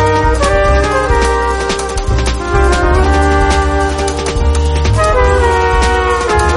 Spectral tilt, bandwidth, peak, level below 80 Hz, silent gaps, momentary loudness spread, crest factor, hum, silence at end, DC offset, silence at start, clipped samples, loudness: -5 dB/octave; 11.5 kHz; 0 dBFS; -14 dBFS; none; 4 LU; 10 dB; none; 0 s; under 0.1%; 0 s; under 0.1%; -12 LUFS